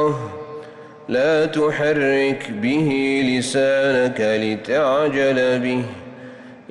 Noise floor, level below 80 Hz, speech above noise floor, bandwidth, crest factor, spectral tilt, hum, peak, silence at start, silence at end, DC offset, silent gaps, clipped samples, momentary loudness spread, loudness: -39 dBFS; -58 dBFS; 20 dB; 11.5 kHz; 10 dB; -5.5 dB/octave; none; -10 dBFS; 0 s; 0.1 s; under 0.1%; none; under 0.1%; 19 LU; -19 LUFS